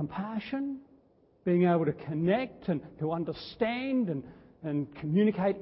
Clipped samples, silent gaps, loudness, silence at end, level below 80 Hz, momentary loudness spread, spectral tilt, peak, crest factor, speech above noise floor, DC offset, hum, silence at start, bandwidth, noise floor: under 0.1%; none; -31 LUFS; 0 s; -64 dBFS; 11 LU; -11.5 dB/octave; -14 dBFS; 16 dB; 34 dB; under 0.1%; none; 0 s; 5.8 kHz; -64 dBFS